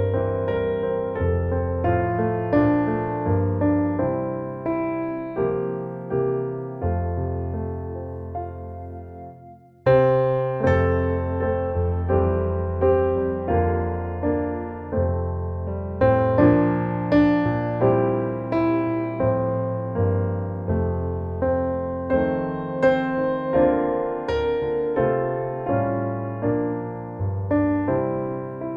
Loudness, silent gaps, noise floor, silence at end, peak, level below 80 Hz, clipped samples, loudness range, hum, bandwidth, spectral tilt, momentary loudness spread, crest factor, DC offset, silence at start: -23 LUFS; none; -46 dBFS; 0 s; -4 dBFS; -40 dBFS; under 0.1%; 6 LU; none; 5.2 kHz; -10.5 dB/octave; 9 LU; 18 dB; under 0.1%; 0 s